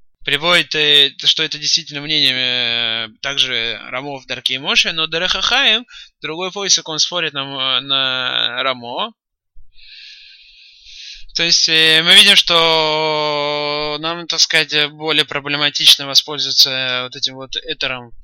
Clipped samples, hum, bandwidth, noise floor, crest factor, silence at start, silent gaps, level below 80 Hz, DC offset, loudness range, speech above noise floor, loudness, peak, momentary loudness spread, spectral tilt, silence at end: under 0.1%; none; 16.5 kHz; -45 dBFS; 16 dB; 0.2 s; none; -50 dBFS; under 0.1%; 8 LU; 29 dB; -13 LUFS; 0 dBFS; 14 LU; -1 dB/octave; 0 s